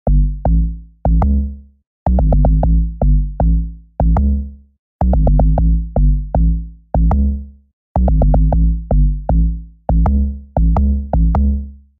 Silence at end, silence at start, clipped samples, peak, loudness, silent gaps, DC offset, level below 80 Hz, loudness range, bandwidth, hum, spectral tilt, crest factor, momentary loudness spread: 0.25 s; 0.05 s; under 0.1%; -2 dBFS; -17 LUFS; 1.87-2.06 s, 4.79-4.99 s, 7.73-7.95 s; under 0.1%; -14 dBFS; 1 LU; 2.1 kHz; none; -13 dB/octave; 12 dB; 8 LU